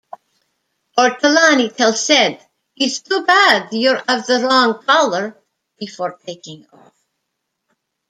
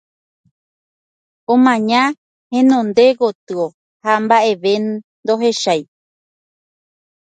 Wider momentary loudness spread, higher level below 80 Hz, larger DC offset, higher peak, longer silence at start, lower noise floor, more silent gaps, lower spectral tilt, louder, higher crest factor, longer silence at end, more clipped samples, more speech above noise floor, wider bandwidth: first, 17 LU vs 11 LU; about the same, -68 dBFS vs -68 dBFS; neither; about the same, 0 dBFS vs 0 dBFS; second, 0.95 s vs 1.5 s; second, -75 dBFS vs under -90 dBFS; second, none vs 2.18-2.50 s, 3.35-3.47 s, 3.74-4.00 s, 5.04-5.23 s; second, -2 dB/octave vs -4.5 dB/octave; about the same, -14 LUFS vs -15 LUFS; about the same, 18 dB vs 16 dB; first, 1.55 s vs 1.4 s; neither; second, 60 dB vs over 76 dB; first, 14.5 kHz vs 9.2 kHz